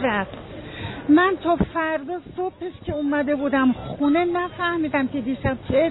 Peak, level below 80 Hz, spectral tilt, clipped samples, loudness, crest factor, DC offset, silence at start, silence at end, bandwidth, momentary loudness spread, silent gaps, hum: -8 dBFS; -44 dBFS; -10 dB/octave; under 0.1%; -23 LUFS; 14 dB; under 0.1%; 0 s; 0 s; 4.1 kHz; 14 LU; none; none